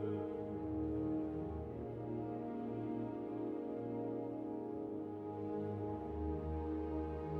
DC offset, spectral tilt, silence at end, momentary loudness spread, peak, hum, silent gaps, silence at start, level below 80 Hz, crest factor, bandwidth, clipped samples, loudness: under 0.1%; -10.5 dB/octave; 0 s; 4 LU; -28 dBFS; none; none; 0 s; -54 dBFS; 14 dB; 4.5 kHz; under 0.1%; -43 LUFS